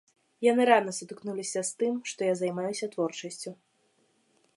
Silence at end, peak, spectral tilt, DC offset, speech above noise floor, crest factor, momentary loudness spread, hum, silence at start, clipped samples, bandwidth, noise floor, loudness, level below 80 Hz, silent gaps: 1 s; -6 dBFS; -4 dB/octave; under 0.1%; 42 dB; 24 dB; 15 LU; none; 0.4 s; under 0.1%; 11.5 kHz; -70 dBFS; -29 LUFS; -82 dBFS; none